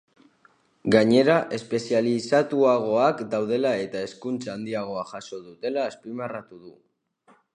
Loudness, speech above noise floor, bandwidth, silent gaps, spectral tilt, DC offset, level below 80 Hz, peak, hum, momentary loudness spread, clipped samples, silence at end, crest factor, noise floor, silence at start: -24 LUFS; 38 dB; 11 kHz; none; -6 dB/octave; under 0.1%; -66 dBFS; -4 dBFS; none; 14 LU; under 0.1%; 0.85 s; 22 dB; -61 dBFS; 0.85 s